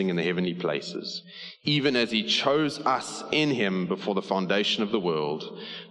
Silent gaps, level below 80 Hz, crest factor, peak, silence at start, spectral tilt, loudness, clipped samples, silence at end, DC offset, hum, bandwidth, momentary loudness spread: none; -70 dBFS; 18 dB; -8 dBFS; 0 s; -5 dB/octave; -26 LUFS; under 0.1%; 0 s; under 0.1%; none; 11.5 kHz; 11 LU